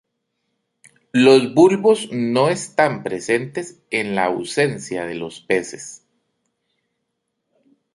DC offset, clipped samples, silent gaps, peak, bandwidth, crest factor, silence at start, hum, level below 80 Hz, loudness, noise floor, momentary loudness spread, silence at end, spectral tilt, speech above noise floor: under 0.1%; under 0.1%; none; -2 dBFS; 11.5 kHz; 18 dB; 1.15 s; none; -62 dBFS; -18 LUFS; -76 dBFS; 16 LU; 2 s; -5 dB/octave; 58 dB